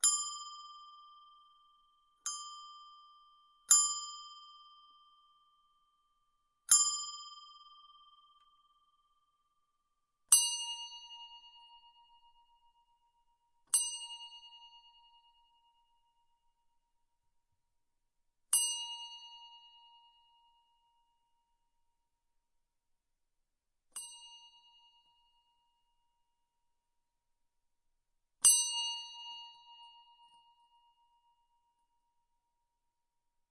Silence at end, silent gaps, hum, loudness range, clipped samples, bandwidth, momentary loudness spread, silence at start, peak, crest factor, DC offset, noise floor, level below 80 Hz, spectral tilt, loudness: 3.65 s; none; none; 21 LU; under 0.1%; 11.5 kHz; 27 LU; 0.05 s; -8 dBFS; 32 dB; under 0.1%; -84 dBFS; -82 dBFS; 5 dB/octave; -29 LUFS